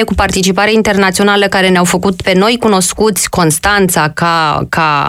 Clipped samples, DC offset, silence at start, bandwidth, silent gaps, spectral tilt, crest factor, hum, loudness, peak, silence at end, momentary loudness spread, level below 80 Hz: under 0.1%; under 0.1%; 0 s; 16.5 kHz; none; -4 dB/octave; 10 dB; none; -10 LUFS; 0 dBFS; 0 s; 3 LU; -30 dBFS